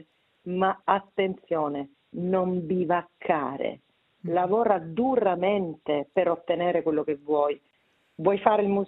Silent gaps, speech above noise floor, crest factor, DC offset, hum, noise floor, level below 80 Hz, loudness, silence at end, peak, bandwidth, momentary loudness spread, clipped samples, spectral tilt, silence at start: none; 42 dB; 22 dB; under 0.1%; none; -68 dBFS; -68 dBFS; -26 LUFS; 0 s; -4 dBFS; 4.1 kHz; 10 LU; under 0.1%; -10.5 dB/octave; 0.45 s